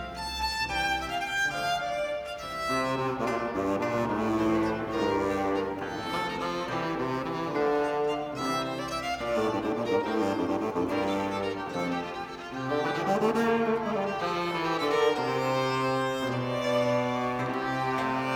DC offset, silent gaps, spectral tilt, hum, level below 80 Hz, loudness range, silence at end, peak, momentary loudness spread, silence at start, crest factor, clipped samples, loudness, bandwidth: under 0.1%; none; -5 dB/octave; none; -54 dBFS; 2 LU; 0 s; -12 dBFS; 6 LU; 0 s; 16 dB; under 0.1%; -29 LUFS; 18 kHz